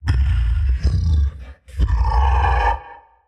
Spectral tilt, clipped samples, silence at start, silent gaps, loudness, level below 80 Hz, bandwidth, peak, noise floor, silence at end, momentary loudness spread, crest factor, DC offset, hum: -7 dB/octave; under 0.1%; 0 s; none; -20 LUFS; -20 dBFS; 6.4 kHz; -6 dBFS; -41 dBFS; 0.3 s; 9 LU; 12 dB; under 0.1%; none